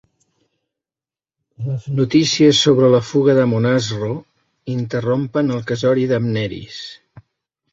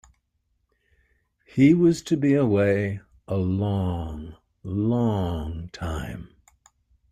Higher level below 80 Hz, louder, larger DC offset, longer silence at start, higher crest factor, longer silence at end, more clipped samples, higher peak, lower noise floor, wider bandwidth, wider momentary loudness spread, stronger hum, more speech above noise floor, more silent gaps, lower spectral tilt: second, -54 dBFS vs -46 dBFS; first, -17 LUFS vs -24 LUFS; neither; about the same, 1.6 s vs 1.55 s; about the same, 18 dB vs 18 dB; second, 0.55 s vs 0.85 s; neither; first, 0 dBFS vs -6 dBFS; first, under -90 dBFS vs -73 dBFS; second, 8 kHz vs 13 kHz; about the same, 17 LU vs 18 LU; neither; first, over 74 dB vs 50 dB; neither; second, -5.5 dB/octave vs -8 dB/octave